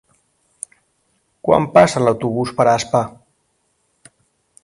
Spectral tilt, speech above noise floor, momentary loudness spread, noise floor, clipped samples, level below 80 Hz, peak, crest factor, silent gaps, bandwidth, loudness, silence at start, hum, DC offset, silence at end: -5.5 dB/octave; 51 dB; 22 LU; -66 dBFS; under 0.1%; -52 dBFS; 0 dBFS; 20 dB; none; 11.5 kHz; -16 LUFS; 1.45 s; none; under 0.1%; 1.55 s